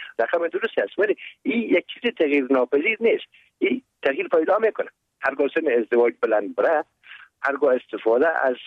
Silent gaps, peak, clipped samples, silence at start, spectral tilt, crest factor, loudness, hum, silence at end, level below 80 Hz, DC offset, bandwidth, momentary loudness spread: none; -8 dBFS; under 0.1%; 0 s; -6 dB/octave; 14 dB; -22 LUFS; none; 0 s; -74 dBFS; under 0.1%; 5.4 kHz; 7 LU